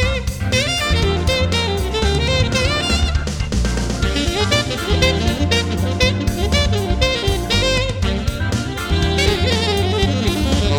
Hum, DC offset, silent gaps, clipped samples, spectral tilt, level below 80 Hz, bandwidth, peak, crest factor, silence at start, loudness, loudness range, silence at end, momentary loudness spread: none; under 0.1%; none; under 0.1%; -4.5 dB/octave; -24 dBFS; 19 kHz; 0 dBFS; 16 dB; 0 s; -18 LUFS; 1 LU; 0 s; 4 LU